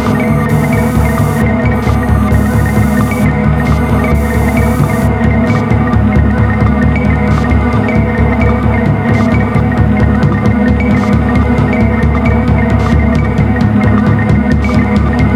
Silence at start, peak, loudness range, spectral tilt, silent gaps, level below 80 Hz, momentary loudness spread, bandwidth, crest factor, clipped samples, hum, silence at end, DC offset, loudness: 0 s; 0 dBFS; 1 LU; -8 dB/octave; none; -16 dBFS; 1 LU; 16 kHz; 10 dB; under 0.1%; none; 0 s; under 0.1%; -11 LUFS